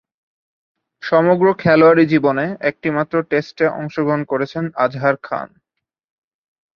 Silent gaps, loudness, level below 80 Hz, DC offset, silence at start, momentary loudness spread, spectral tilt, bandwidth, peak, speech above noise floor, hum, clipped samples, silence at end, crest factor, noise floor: none; -17 LUFS; -60 dBFS; under 0.1%; 1.05 s; 11 LU; -8.5 dB/octave; 6.6 kHz; 0 dBFS; 64 dB; none; under 0.1%; 1.3 s; 18 dB; -80 dBFS